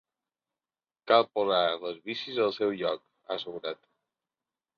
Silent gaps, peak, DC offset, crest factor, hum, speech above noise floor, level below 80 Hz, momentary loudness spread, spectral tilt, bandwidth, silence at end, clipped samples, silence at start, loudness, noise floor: none; -8 dBFS; under 0.1%; 24 dB; none; over 62 dB; -76 dBFS; 14 LU; -5.5 dB/octave; 6.8 kHz; 1.05 s; under 0.1%; 1.05 s; -29 LUFS; under -90 dBFS